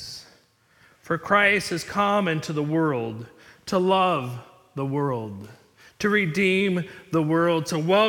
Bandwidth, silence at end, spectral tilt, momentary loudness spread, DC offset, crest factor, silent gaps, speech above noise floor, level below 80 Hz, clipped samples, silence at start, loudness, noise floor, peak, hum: 18 kHz; 0 s; -5.5 dB/octave; 18 LU; under 0.1%; 18 dB; none; 37 dB; -62 dBFS; under 0.1%; 0 s; -23 LUFS; -60 dBFS; -6 dBFS; none